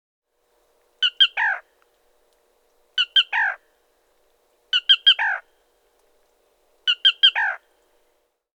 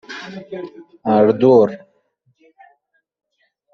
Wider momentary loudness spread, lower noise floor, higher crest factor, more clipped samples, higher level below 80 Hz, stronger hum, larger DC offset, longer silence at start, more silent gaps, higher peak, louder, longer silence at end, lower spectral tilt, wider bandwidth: second, 14 LU vs 21 LU; first, -68 dBFS vs -64 dBFS; about the same, 20 dB vs 18 dB; neither; second, -78 dBFS vs -64 dBFS; neither; neither; first, 1 s vs 0.1 s; neither; about the same, -4 dBFS vs -2 dBFS; second, -18 LUFS vs -14 LUFS; second, 1 s vs 1.95 s; second, 4.5 dB/octave vs -6.5 dB/octave; first, 9.8 kHz vs 6.8 kHz